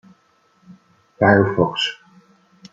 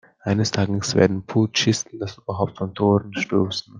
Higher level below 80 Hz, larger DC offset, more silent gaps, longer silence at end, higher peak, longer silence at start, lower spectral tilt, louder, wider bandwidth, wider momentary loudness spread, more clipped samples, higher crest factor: about the same, -56 dBFS vs -58 dBFS; neither; neither; first, 0.8 s vs 0 s; about the same, -2 dBFS vs -2 dBFS; first, 0.7 s vs 0.25 s; about the same, -6 dB/octave vs -5 dB/octave; first, -17 LUFS vs -22 LUFS; second, 7.8 kHz vs 9.8 kHz; first, 10 LU vs 7 LU; neither; about the same, 20 dB vs 20 dB